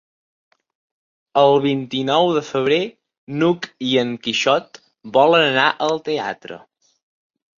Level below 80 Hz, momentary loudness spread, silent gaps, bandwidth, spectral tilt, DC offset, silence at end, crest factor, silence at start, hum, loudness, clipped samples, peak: -64 dBFS; 13 LU; 3.18-3.27 s; 7.6 kHz; -5 dB/octave; under 0.1%; 1 s; 18 dB; 1.35 s; none; -18 LUFS; under 0.1%; -2 dBFS